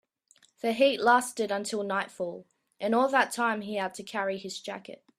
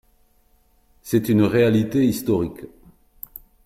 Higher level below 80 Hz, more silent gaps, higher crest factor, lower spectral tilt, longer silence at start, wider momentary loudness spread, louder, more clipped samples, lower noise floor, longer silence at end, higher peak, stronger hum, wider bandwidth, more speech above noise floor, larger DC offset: second, -78 dBFS vs -52 dBFS; neither; about the same, 20 dB vs 16 dB; second, -3.5 dB/octave vs -7 dB/octave; second, 0.65 s vs 1.05 s; second, 13 LU vs 23 LU; second, -28 LUFS vs -20 LUFS; neither; first, -64 dBFS vs -59 dBFS; second, 0.25 s vs 1 s; about the same, -8 dBFS vs -6 dBFS; neither; second, 14.5 kHz vs 16.5 kHz; second, 36 dB vs 40 dB; neither